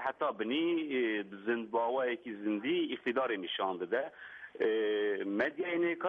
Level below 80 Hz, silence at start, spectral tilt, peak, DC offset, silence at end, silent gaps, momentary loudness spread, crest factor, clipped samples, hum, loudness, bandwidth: -82 dBFS; 0 s; -7 dB/octave; -20 dBFS; under 0.1%; 0 s; none; 4 LU; 14 dB; under 0.1%; none; -34 LUFS; 4.8 kHz